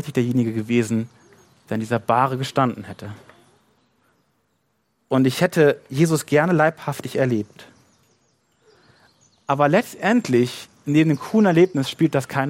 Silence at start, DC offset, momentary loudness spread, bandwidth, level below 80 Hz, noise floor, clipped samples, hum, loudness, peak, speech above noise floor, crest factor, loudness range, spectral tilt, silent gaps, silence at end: 0 s; under 0.1%; 12 LU; 16.5 kHz; -64 dBFS; -69 dBFS; under 0.1%; none; -20 LUFS; -2 dBFS; 50 dB; 18 dB; 6 LU; -6.5 dB/octave; none; 0 s